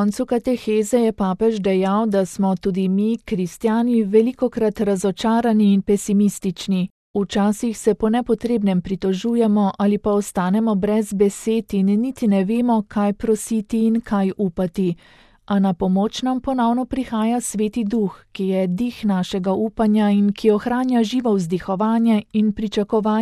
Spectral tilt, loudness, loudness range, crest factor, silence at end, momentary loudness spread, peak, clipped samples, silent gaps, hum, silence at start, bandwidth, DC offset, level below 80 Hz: -6.5 dB/octave; -20 LUFS; 3 LU; 16 dB; 0 s; 5 LU; -4 dBFS; under 0.1%; 6.91-7.14 s; none; 0 s; 13 kHz; under 0.1%; -48 dBFS